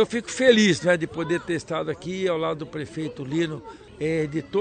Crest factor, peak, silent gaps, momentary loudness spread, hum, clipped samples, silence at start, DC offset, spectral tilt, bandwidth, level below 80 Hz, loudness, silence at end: 20 dB; -4 dBFS; none; 14 LU; none; under 0.1%; 0 s; under 0.1%; -5 dB/octave; 9.4 kHz; -56 dBFS; -24 LUFS; 0 s